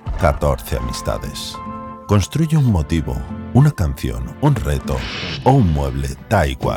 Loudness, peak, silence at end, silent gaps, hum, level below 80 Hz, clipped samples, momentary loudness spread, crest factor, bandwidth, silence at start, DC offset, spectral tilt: -19 LUFS; 0 dBFS; 0 s; none; none; -28 dBFS; under 0.1%; 11 LU; 18 dB; 18 kHz; 0.05 s; under 0.1%; -6.5 dB/octave